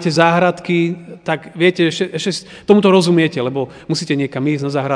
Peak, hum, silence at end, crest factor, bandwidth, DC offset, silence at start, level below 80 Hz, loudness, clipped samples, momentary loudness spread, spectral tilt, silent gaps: 0 dBFS; none; 0 s; 16 dB; 10 kHz; under 0.1%; 0 s; -58 dBFS; -16 LUFS; under 0.1%; 11 LU; -5.5 dB/octave; none